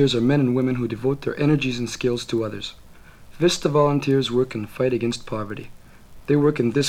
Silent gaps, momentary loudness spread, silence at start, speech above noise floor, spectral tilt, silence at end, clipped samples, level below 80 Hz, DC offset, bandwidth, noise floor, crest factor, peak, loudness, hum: none; 11 LU; 0 s; 23 dB; -6 dB/octave; 0 s; under 0.1%; -48 dBFS; under 0.1%; 15.5 kHz; -44 dBFS; 16 dB; -6 dBFS; -22 LUFS; none